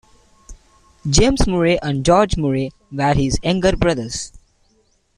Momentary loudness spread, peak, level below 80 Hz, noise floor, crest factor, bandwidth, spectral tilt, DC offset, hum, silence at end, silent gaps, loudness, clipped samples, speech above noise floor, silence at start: 12 LU; -2 dBFS; -28 dBFS; -60 dBFS; 16 dB; 11.5 kHz; -5 dB/octave; under 0.1%; none; 0.9 s; none; -18 LUFS; under 0.1%; 44 dB; 0.5 s